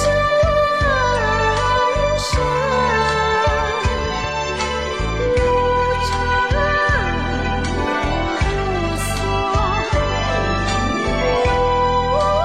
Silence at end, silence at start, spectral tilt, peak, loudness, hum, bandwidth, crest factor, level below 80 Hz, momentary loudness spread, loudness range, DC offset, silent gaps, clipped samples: 0 s; 0 s; -5 dB/octave; -8 dBFS; -18 LUFS; none; 14.5 kHz; 10 dB; -26 dBFS; 5 LU; 3 LU; 0.4%; none; under 0.1%